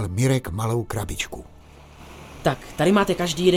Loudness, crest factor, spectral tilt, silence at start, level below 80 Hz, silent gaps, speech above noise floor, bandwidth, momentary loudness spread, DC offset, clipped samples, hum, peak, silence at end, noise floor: -23 LUFS; 18 dB; -5.5 dB/octave; 0 s; -42 dBFS; none; 24 dB; 17 kHz; 21 LU; under 0.1%; under 0.1%; none; -4 dBFS; 0 s; -45 dBFS